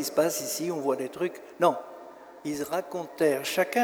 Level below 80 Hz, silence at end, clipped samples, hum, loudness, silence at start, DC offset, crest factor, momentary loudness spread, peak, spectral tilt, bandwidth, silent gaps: -72 dBFS; 0 s; under 0.1%; none; -29 LUFS; 0 s; under 0.1%; 18 dB; 13 LU; -10 dBFS; -3.5 dB/octave; over 20 kHz; none